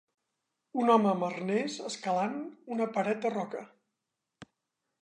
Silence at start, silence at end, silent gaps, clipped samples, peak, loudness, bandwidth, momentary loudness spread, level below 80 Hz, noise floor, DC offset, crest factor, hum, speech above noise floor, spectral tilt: 0.75 s; 0.6 s; none; under 0.1%; -12 dBFS; -31 LUFS; 10 kHz; 13 LU; -82 dBFS; -86 dBFS; under 0.1%; 20 dB; none; 56 dB; -5.5 dB/octave